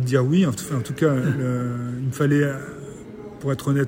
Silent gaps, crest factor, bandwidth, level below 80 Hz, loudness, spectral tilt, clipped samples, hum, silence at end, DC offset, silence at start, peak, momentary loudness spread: none; 16 dB; 16 kHz; -54 dBFS; -23 LUFS; -7 dB/octave; under 0.1%; none; 0 s; under 0.1%; 0 s; -6 dBFS; 17 LU